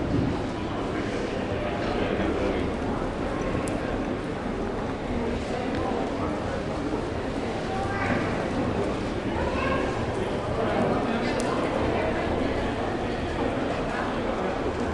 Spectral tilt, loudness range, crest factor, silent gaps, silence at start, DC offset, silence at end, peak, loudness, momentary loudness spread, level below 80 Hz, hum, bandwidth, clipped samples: -6.5 dB/octave; 3 LU; 16 dB; none; 0 s; under 0.1%; 0 s; -10 dBFS; -28 LUFS; 4 LU; -40 dBFS; none; 11.5 kHz; under 0.1%